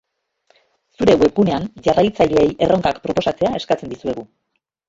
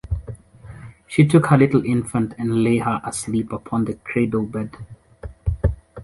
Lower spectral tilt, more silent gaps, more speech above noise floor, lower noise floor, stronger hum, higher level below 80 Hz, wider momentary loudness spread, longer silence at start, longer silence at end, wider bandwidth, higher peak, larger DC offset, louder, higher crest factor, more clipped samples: about the same, -6.5 dB/octave vs -7 dB/octave; neither; first, 45 dB vs 22 dB; first, -62 dBFS vs -41 dBFS; neither; second, -44 dBFS vs -34 dBFS; second, 10 LU vs 24 LU; first, 1 s vs 0.05 s; first, 0.65 s vs 0 s; second, 7.8 kHz vs 11.5 kHz; about the same, -2 dBFS vs -2 dBFS; neither; first, -17 LUFS vs -20 LUFS; about the same, 16 dB vs 18 dB; neither